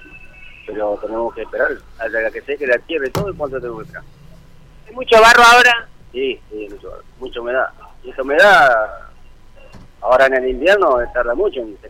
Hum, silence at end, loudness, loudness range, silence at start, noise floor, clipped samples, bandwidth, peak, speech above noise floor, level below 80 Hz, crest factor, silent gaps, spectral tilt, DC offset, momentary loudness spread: none; 0 s; -14 LUFS; 9 LU; 0.15 s; -41 dBFS; under 0.1%; 16.5 kHz; -2 dBFS; 26 dB; -40 dBFS; 14 dB; none; -3 dB/octave; under 0.1%; 22 LU